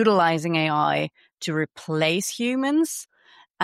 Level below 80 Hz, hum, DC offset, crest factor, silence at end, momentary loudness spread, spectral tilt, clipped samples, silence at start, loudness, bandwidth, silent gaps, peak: -70 dBFS; none; under 0.1%; 16 dB; 0 s; 8 LU; -4.5 dB/octave; under 0.1%; 0 s; -23 LUFS; 15.5 kHz; 1.34-1.38 s; -8 dBFS